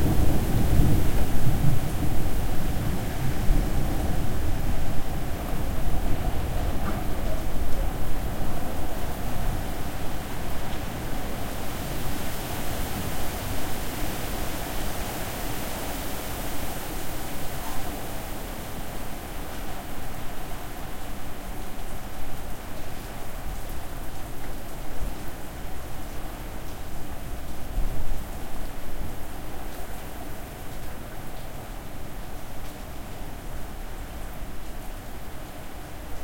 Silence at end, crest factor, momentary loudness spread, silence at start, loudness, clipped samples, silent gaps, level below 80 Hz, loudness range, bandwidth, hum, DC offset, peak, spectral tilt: 0 s; 18 dB; 11 LU; 0 s; -33 LUFS; under 0.1%; none; -32 dBFS; 10 LU; 16.5 kHz; none; under 0.1%; -4 dBFS; -5 dB/octave